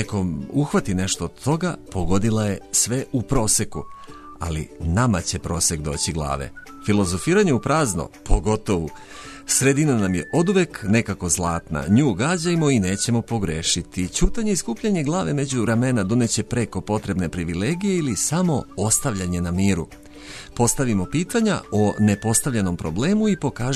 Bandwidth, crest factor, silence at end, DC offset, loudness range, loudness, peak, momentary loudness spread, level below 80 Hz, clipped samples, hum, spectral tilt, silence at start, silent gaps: 13.5 kHz; 18 dB; 0 s; under 0.1%; 2 LU; -21 LUFS; -4 dBFS; 9 LU; -36 dBFS; under 0.1%; none; -4.5 dB/octave; 0 s; none